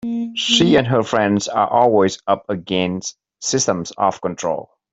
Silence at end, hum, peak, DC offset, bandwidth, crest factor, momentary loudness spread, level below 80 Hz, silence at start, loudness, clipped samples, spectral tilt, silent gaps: 0.3 s; none; -2 dBFS; under 0.1%; 8.2 kHz; 16 dB; 10 LU; -54 dBFS; 0.05 s; -18 LUFS; under 0.1%; -4 dB/octave; none